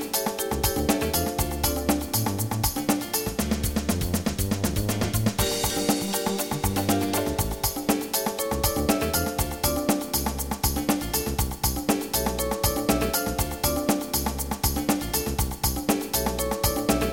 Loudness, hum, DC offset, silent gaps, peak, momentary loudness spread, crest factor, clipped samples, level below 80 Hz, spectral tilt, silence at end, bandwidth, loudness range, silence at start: -25 LUFS; none; 0.2%; none; -6 dBFS; 3 LU; 18 dB; under 0.1%; -36 dBFS; -4 dB/octave; 0 s; 17 kHz; 1 LU; 0 s